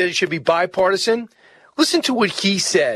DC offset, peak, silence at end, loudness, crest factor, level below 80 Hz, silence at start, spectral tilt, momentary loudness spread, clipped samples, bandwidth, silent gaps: under 0.1%; 0 dBFS; 0 s; -18 LUFS; 18 dB; -62 dBFS; 0 s; -3 dB/octave; 6 LU; under 0.1%; 13.5 kHz; none